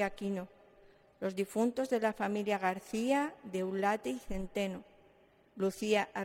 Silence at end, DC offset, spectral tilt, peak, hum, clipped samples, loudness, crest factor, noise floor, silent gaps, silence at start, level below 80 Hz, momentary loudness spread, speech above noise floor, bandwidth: 0 s; under 0.1%; -5 dB/octave; -18 dBFS; none; under 0.1%; -35 LUFS; 18 dB; -65 dBFS; none; 0 s; -58 dBFS; 8 LU; 31 dB; 16.5 kHz